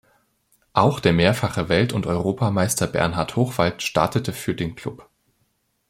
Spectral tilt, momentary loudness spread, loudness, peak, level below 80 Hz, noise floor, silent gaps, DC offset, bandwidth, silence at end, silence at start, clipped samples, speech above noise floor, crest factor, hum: -5.5 dB/octave; 9 LU; -21 LUFS; -2 dBFS; -48 dBFS; -69 dBFS; none; under 0.1%; 16.5 kHz; 0.9 s; 0.75 s; under 0.1%; 48 dB; 20 dB; none